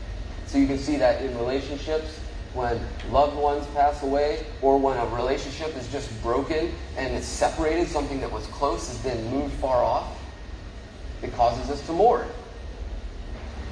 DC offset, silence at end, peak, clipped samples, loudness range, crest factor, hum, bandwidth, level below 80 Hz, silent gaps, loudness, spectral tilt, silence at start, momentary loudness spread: under 0.1%; 0 s; -6 dBFS; under 0.1%; 3 LU; 20 dB; none; 10.5 kHz; -36 dBFS; none; -25 LUFS; -5.5 dB/octave; 0 s; 16 LU